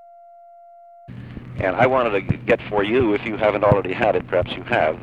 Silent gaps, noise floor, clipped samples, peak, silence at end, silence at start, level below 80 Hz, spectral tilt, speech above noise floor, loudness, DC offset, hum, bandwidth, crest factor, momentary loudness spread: none; -45 dBFS; under 0.1%; 0 dBFS; 0 s; 1.1 s; -44 dBFS; -8 dB/octave; 26 dB; -20 LUFS; under 0.1%; none; 8.4 kHz; 20 dB; 18 LU